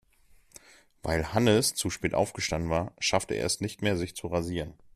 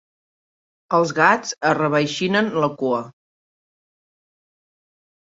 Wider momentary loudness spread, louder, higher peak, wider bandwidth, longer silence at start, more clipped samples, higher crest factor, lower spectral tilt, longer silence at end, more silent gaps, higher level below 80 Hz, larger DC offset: about the same, 8 LU vs 7 LU; second, -29 LUFS vs -19 LUFS; second, -10 dBFS vs -2 dBFS; first, 15 kHz vs 8 kHz; first, 1.05 s vs 0.9 s; neither; about the same, 20 dB vs 22 dB; about the same, -4 dB/octave vs -4.5 dB/octave; second, 0.2 s vs 2.1 s; neither; first, -50 dBFS vs -66 dBFS; neither